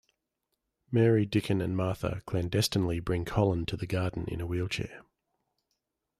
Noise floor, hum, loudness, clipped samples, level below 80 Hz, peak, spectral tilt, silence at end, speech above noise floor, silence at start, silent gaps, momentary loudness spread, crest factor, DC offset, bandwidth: -83 dBFS; none; -30 LUFS; under 0.1%; -52 dBFS; -12 dBFS; -6 dB/octave; 1.2 s; 54 dB; 0.9 s; none; 9 LU; 18 dB; under 0.1%; 14.5 kHz